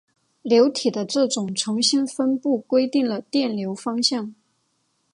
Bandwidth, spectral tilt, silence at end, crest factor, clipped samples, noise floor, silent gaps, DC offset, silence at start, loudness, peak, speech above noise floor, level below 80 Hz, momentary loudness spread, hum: 11.5 kHz; -4 dB/octave; 0.8 s; 18 dB; under 0.1%; -70 dBFS; none; under 0.1%; 0.45 s; -21 LUFS; -4 dBFS; 48 dB; -74 dBFS; 9 LU; none